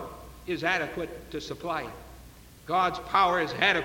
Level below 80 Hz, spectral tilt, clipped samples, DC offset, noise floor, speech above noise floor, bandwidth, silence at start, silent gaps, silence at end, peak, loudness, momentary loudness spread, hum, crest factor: -52 dBFS; -4 dB/octave; under 0.1%; under 0.1%; -50 dBFS; 22 dB; 17 kHz; 0 s; none; 0 s; -8 dBFS; -28 LUFS; 19 LU; none; 22 dB